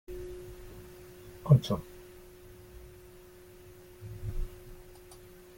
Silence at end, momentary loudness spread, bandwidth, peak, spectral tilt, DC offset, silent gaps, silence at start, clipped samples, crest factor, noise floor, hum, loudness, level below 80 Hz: 0 s; 27 LU; 17 kHz; -8 dBFS; -8 dB/octave; under 0.1%; none; 0.1 s; under 0.1%; 26 dB; -53 dBFS; none; -31 LUFS; -46 dBFS